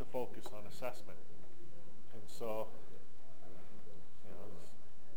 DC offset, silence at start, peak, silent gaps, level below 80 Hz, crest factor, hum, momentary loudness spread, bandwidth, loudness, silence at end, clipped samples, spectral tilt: 3%; 0 s; -24 dBFS; none; -72 dBFS; 22 dB; none; 17 LU; 17 kHz; -49 LUFS; 0 s; under 0.1%; -5.5 dB/octave